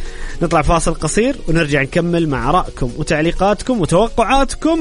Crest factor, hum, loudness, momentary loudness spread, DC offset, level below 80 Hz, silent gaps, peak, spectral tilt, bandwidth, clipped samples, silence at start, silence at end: 14 dB; none; -16 LUFS; 4 LU; under 0.1%; -24 dBFS; none; -2 dBFS; -5.5 dB/octave; 11 kHz; under 0.1%; 0 s; 0 s